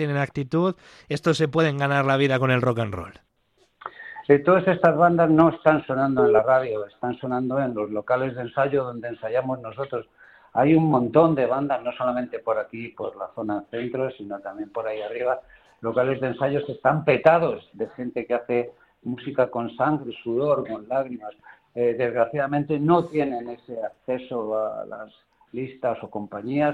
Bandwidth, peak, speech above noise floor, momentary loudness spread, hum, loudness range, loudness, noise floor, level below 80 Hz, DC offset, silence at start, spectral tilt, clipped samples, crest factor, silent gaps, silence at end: 10.5 kHz; -2 dBFS; 42 dB; 15 LU; none; 8 LU; -23 LUFS; -65 dBFS; -60 dBFS; under 0.1%; 0 s; -7.5 dB/octave; under 0.1%; 20 dB; none; 0 s